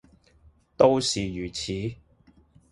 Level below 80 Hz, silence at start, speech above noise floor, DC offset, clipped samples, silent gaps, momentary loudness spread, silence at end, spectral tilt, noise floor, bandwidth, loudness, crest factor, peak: -52 dBFS; 0.8 s; 35 dB; under 0.1%; under 0.1%; none; 12 LU; 0.75 s; -4.5 dB/octave; -59 dBFS; 11.5 kHz; -25 LUFS; 24 dB; -2 dBFS